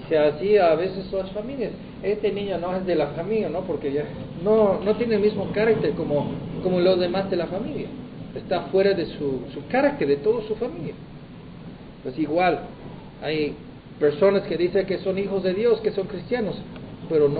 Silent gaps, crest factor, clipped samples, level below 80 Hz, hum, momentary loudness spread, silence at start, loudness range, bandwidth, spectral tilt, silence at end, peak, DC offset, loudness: none; 16 dB; under 0.1%; -50 dBFS; none; 16 LU; 0 s; 4 LU; 4.9 kHz; -11 dB/octave; 0 s; -6 dBFS; under 0.1%; -24 LUFS